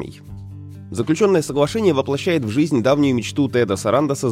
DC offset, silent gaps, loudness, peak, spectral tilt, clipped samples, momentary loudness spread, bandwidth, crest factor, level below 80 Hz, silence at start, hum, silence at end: under 0.1%; none; -18 LUFS; -4 dBFS; -6 dB/octave; under 0.1%; 19 LU; 15.5 kHz; 16 dB; -50 dBFS; 0 s; none; 0 s